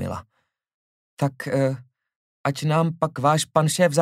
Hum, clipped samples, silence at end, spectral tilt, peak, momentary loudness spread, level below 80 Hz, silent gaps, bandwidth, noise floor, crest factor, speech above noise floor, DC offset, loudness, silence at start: none; under 0.1%; 0 s; -5.5 dB/octave; -4 dBFS; 11 LU; -62 dBFS; 0.74-1.17 s, 2.16-2.44 s; 15.5 kHz; -72 dBFS; 20 dB; 51 dB; under 0.1%; -23 LUFS; 0 s